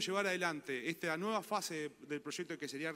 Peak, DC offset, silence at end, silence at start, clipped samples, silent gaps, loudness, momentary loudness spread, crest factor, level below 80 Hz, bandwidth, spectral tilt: -20 dBFS; under 0.1%; 0 s; 0 s; under 0.1%; none; -39 LUFS; 8 LU; 18 dB; -84 dBFS; 16 kHz; -3.5 dB/octave